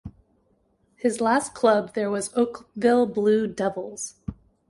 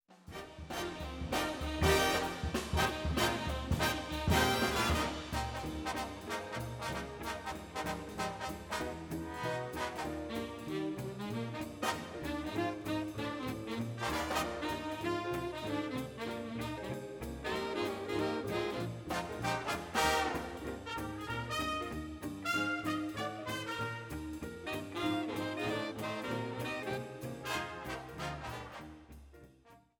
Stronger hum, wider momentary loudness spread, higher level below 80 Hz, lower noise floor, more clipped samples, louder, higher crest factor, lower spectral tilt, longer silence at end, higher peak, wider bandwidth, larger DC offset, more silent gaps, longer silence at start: neither; first, 13 LU vs 10 LU; about the same, -54 dBFS vs -50 dBFS; first, -66 dBFS vs -62 dBFS; neither; first, -24 LUFS vs -37 LUFS; about the same, 18 dB vs 22 dB; about the same, -5 dB/octave vs -4.5 dB/octave; first, 0.35 s vs 0.2 s; first, -6 dBFS vs -16 dBFS; second, 11.5 kHz vs 19 kHz; neither; neither; about the same, 0.05 s vs 0.1 s